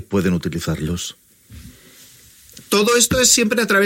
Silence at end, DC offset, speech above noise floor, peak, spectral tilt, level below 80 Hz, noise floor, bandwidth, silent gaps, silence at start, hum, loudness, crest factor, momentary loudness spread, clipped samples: 0 s; under 0.1%; 29 dB; 0 dBFS; -3 dB/octave; -42 dBFS; -46 dBFS; 16.5 kHz; none; 0 s; none; -16 LUFS; 20 dB; 12 LU; under 0.1%